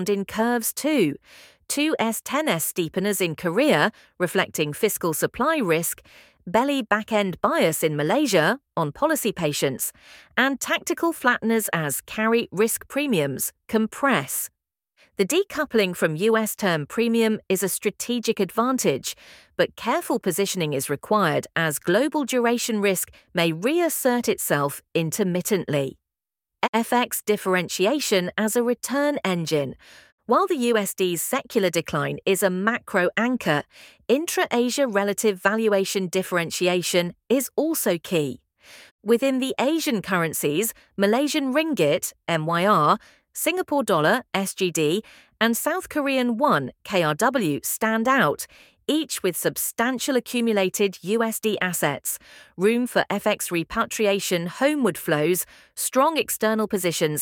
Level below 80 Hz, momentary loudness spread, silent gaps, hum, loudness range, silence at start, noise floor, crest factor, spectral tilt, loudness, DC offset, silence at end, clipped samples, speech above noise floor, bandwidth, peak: -62 dBFS; 5 LU; 26.69-26.73 s, 30.12-30.18 s, 38.91-38.99 s; none; 2 LU; 0 s; -89 dBFS; 20 dB; -4 dB/octave; -23 LUFS; under 0.1%; 0 s; under 0.1%; 66 dB; 19 kHz; -2 dBFS